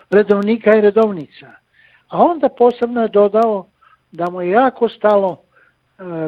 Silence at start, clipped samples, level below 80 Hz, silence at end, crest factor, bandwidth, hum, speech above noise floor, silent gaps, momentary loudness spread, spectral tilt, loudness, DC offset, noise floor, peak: 0.1 s; under 0.1%; -60 dBFS; 0 s; 16 dB; 5.6 kHz; none; 41 dB; none; 15 LU; -8.5 dB/octave; -15 LUFS; under 0.1%; -55 dBFS; 0 dBFS